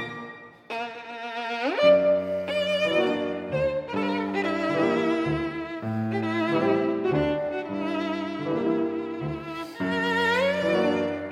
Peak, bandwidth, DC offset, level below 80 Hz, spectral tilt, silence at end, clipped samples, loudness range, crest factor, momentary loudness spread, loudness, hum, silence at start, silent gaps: -8 dBFS; 12.5 kHz; under 0.1%; -56 dBFS; -6.5 dB/octave; 0 s; under 0.1%; 3 LU; 18 dB; 11 LU; -26 LUFS; none; 0 s; none